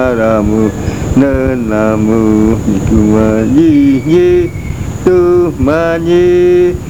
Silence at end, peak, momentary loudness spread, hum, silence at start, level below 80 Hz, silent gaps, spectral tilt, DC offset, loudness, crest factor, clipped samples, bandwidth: 0 s; 0 dBFS; 5 LU; none; 0 s; -24 dBFS; none; -7.5 dB/octave; 2%; -10 LUFS; 10 dB; 0.4%; 15 kHz